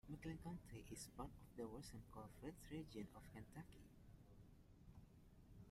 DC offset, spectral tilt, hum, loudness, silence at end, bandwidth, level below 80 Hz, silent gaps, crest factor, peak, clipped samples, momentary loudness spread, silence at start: under 0.1%; -5.5 dB/octave; none; -58 LUFS; 0 s; 16 kHz; -68 dBFS; none; 18 dB; -40 dBFS; under 0.1%; 14 LU; 0.05 s